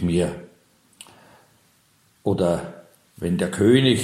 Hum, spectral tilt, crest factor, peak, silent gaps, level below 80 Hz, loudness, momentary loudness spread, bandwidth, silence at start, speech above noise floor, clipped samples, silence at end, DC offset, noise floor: none; -6 dB/octave; 20 dB; -4 dBFS; none; -50 dBFS; -22 LUFS; 15 LU; 14.5 kHz; 0 s; 41 dB; under 0.1%; 0 s; under 0.1%; -61 dBFS